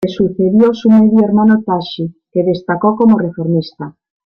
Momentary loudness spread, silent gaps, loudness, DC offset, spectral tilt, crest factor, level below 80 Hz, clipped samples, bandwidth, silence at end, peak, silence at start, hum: 13 LU; none; -12 LUFS; under 0.1%; -9 dB/octave; 12 dB; -52 dBFS; under 0.1%; 6.2 kHz; 0.4 s; -2 dBFS; 0 s; none